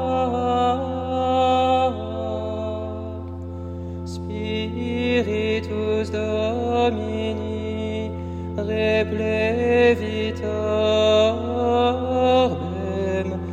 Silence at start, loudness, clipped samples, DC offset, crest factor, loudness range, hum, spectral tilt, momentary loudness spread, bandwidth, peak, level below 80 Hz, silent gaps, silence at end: 0 s; -22 LUFS; under 0.1%; under 0.1%; 16 dB; 6 LU; none; -6.5 dB/octave; 12 LU; 9.4 kHz; -6 dBFS; -48 dBFS; none; 0 s